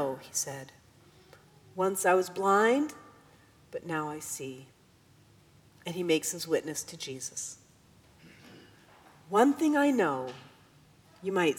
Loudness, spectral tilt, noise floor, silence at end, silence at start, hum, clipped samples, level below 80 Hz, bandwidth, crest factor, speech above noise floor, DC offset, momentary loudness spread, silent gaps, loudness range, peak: -30 LUFS; -3.5 dB/octave; -61 dBFS; 0 s; 0 s; none; under 0.1%; -74 dBFS; 19 kHz; 20 dB; 32 dB; under 0.1%; 19 LU; none; 6 LU; -10 dBFS